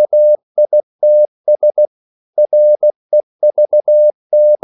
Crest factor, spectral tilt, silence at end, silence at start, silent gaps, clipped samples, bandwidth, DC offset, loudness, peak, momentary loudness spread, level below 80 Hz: 6 dB; -10.5 dB/octave; 0.1 s; 0 s; 0.43-0.55 s, 0.83-0.99 s, 1.28-1.44 s, 1.87-2.33 s, 2.96-3.09 s, 3.23-3.39 s, 4.14-4.30 s; under 0.1%; 0.9 kHz; under 0.1%; -12 LUFS; -4 dBFS; 6 LU; -84 dBFS